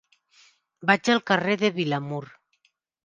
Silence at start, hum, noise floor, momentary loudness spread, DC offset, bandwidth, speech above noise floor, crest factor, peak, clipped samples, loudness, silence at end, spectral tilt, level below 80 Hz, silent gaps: 0.8 s; none; -70 dBFS; 11 LU; under 0.1%; 9.8 kHz; 46 dB; 20 dB; -6 dBFS; under 0.1%; -24 LUFS; 0.8 s; -5 dB/octave; -68 dBFS; none